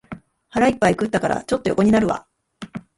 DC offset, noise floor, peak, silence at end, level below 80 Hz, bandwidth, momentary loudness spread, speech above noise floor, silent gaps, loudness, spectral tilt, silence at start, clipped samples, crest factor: under 0.1%; -40 dBFS; -4 dBFS; 0.2 s; -48 dBFS; 11.5 kHz; 21 LU; 21 dB; none; -20 LUFS; -6 dB/octave; 0.1 s; under 0.1%; 18 dB